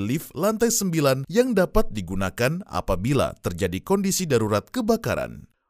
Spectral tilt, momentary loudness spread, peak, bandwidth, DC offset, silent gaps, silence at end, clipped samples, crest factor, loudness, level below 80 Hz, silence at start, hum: -5 dB/octave; 7 LU; -4 dBFS; 16 kHz; under 0.1%; none; 0.3 s; under 0.1%; 20 dB; -23 LUFS; -38 dBFS; 0 s; none